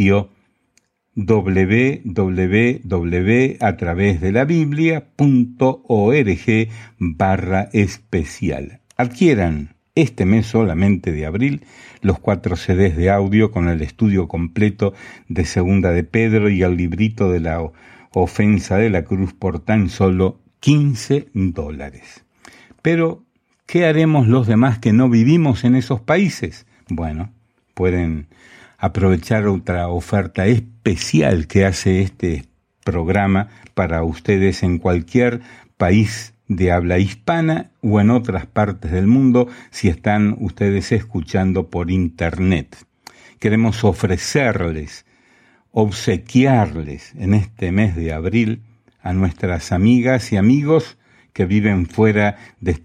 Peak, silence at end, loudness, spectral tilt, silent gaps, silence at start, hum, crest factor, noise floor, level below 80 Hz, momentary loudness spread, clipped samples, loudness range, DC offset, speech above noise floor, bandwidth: -2 dBFS; 0.05 s; -17 LUFS; -7.5 dB/octave; none; 0 s; none; 16 dB; -63 dBFS; -38 dBFS; 10 LU; under 0.1%; 3 LU; under 0.1%; 46 dB; 11 kHz